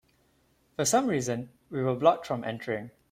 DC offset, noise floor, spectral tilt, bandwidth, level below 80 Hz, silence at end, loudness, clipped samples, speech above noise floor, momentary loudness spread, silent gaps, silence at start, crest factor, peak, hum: under 0.1%; -68 dBFS; -4.5 dB/octave; 16.5 kHz; -66 dBFS; 0.25 s; -28 LUFS; under 0.1%; 40 dB; 12 LU; none; 0.8 s; 22 dB; -8 dBFS; none